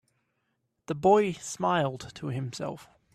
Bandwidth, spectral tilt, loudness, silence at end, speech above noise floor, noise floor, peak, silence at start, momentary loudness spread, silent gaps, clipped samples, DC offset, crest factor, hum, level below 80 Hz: 13.5 kHz; -5.5 dB/octave; -28 LUFS; 0.3 s; 50 dB; -78 dBFS; -10 dBFS; 0.9 s; 15 LU; none; under 0.1%; under 0.1%; 20 dB; none; -64 dBFS